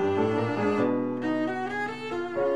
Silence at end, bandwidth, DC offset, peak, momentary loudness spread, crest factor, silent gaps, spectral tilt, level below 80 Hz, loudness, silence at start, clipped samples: 0 s; 10.5 kHz; 0.3%; -14 dBFS; 6 LU; 14 dB; none; -7 dB/octave; -66 dBFS; -28 LUFS; 0 s; under 0.1%